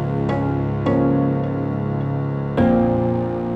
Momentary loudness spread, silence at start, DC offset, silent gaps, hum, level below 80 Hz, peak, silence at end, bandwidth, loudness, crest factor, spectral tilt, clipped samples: 6 LU; 0 s; under 0.1%; none; none; -40 dBFS; -6 dBFS; 0 s; 5.2 kHz; -20 LUFS; 14 dB; -10.5 dB/octave; under 0.1%